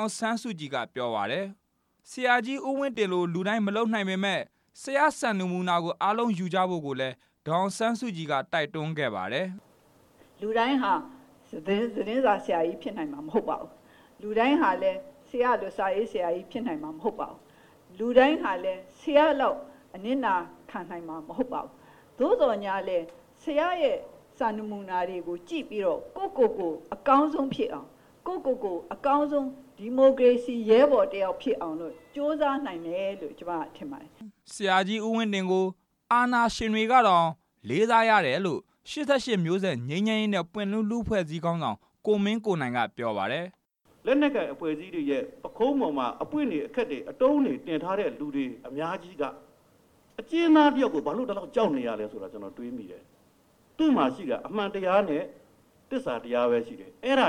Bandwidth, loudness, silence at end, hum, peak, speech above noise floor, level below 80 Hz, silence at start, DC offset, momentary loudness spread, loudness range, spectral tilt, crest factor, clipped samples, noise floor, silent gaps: 12.5 kHz; -27 LUFS; 0 s; none; -6 dBFS; 36 dB; -62 dBFS; 0 s; under 0.1%; 15 LU; 6 LU; -5.5 dB/octave; 22 dB; under 0.1%; -62 dBFS; none